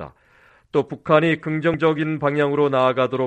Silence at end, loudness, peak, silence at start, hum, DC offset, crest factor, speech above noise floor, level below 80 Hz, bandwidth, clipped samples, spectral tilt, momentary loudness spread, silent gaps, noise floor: 0 s; -20 LUFS; -2 dBFS; 0 s; none; under 0.1%; 18 dB; 35 dB; -56 dBFS; 8.8 kHz; under 0.1%; -8 dB/octave; 7 LU; none; -55 dBFS